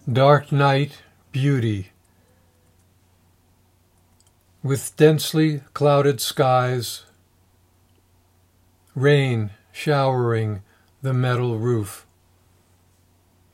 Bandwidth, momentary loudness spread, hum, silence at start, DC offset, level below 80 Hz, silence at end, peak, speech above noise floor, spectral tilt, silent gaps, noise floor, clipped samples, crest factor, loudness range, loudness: 16 kHz; 15 LU; none; 0.05 s; under 0.1%; -66 dBFS; 1.55 s; -2 dBFS; 40 dB; -6 dB/octave; none; -60 dBFS; under 0.1%; 22 dB; 9 LU; -21 LUFS